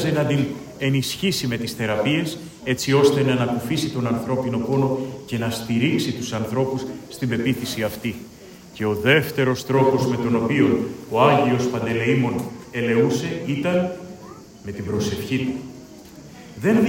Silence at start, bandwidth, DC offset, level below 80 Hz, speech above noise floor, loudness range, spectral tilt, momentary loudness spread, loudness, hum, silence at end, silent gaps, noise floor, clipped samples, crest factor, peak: 0 s; 16.5 kHz; under 0.1%; -54 dBFS; 21 dB; 5 LU; -6 dB/octave; 15 LU; -22 LUFS; none; 0 s; none; -42 dBFS; under 0.1%; 20 dB; -2 dBFS